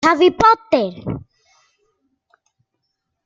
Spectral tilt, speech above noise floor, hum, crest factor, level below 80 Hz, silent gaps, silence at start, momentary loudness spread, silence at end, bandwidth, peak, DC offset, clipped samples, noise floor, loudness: -5.5 dB/octave; 60 dB; none; 18 dB; -50 dBFS; none; 0 s; 17 LU; 2.05 s; 7.6 kHz; -2 dBFS; under 0.1%; under 0.1%; -75 dBFS; -16 LUFS